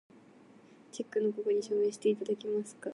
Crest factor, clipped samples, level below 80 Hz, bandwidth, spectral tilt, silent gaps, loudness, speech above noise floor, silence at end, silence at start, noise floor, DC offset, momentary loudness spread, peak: 16 dB; under 0.1%; -88 dBFS; 11.5 kHz; -5.5 dB/octave; none; -33 LUFS; 26 dB; 0 s; 0.95 s; -58 dBFS; under 0.1%; 7 LU; -18 dBFS